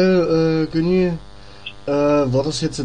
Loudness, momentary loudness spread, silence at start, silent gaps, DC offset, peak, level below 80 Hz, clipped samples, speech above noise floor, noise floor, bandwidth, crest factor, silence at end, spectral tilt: -18 LUFS; 15 LU; 0 s; none; 1%; -4 dBFS; -42 dBFS; under 0.1%; 21 dB; -38 dBFS; 10 kHz; 14 dB; 0 s; -6.5 dB/octave